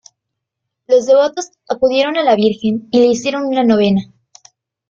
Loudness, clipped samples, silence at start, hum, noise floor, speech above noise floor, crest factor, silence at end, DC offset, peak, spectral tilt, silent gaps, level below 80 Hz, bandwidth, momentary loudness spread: -14 LUFS; under 0.1%; 0.9 s; none; -78 dBFS; 64 dB; 14 dB; 0.85 s; under 0.1%; -2 dBFS; -5.5 dB/octave; none; -56 dBFS; 7.6 kHz; 7 LU